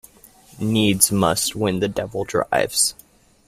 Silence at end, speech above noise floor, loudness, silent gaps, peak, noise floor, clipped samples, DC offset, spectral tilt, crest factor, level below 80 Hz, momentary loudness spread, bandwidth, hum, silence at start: 0.55 s; 29 dB; -20 LUFS; none; 0 dBFS; -49 dBFS; under 0.1%; under 0.1%; -3.5 dB/octave; 22 dB; -50 dBFS; 8 LU; 16 kHz; none; 0.55 s